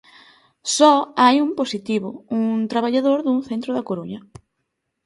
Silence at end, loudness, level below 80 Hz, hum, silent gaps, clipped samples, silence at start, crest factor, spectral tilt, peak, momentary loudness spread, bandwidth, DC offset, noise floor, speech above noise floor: 0.85 s; -19 LUFS; -64 dBFS; none; none; under 0.1%; 0.65 s; 20 dB; -4 dB/octave; -2 dBFS; 14 LU; 11.5 kHz; under 0.1%; -76 dBFS; 57 dB